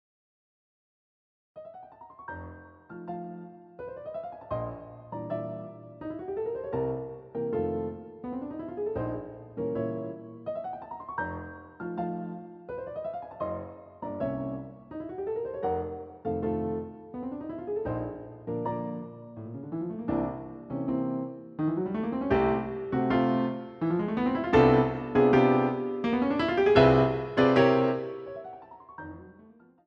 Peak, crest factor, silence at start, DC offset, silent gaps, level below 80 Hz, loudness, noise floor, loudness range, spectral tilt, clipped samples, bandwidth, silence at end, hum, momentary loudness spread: -8 dBFS; 22 dB; 1.55 s; under 0.1%; none; -52 dBFS; -29 LUFS; -56 dBFS; 15 LU; -8.5 dB/octave; under 0.1%; 6.8 kHz; 0.35 s; none; 20 LU